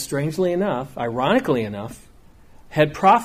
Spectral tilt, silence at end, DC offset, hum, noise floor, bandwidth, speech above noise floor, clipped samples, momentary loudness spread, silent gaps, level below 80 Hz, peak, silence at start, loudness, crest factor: -6 dB/octave; 0 s; under 0.1%; none; -47 dBFS; 15.5 kHz; 27 dB; under 0.1%; 12 LU; none; -52 dBFS; -4 dBFS; 0 s; -21 LUFS; 18 dB